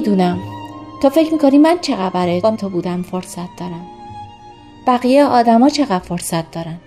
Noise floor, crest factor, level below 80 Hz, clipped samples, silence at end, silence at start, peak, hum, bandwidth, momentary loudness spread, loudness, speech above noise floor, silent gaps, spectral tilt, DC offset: -39 dBFS; 14 dB; -50 dBFS; under 0.1%; 0.1 s; 0 s; 0 dBFS; none; 15 kHz; 20 LU; -15 LUFS; 24 dB; none; -6 dB/octave; under 0.1%